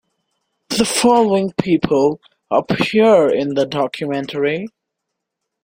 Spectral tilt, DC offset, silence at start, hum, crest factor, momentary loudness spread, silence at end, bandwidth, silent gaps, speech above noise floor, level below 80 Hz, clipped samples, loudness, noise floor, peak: -4.5 dB/octave; under 0.1%; 0.7 s; none; 16 dB; 10 LU; 0.95 s; 16.5 kHz; none; 63 dB; -52 dBFS; under 0.1%; -16 LUFS; -78 dBFS; -2 dBFS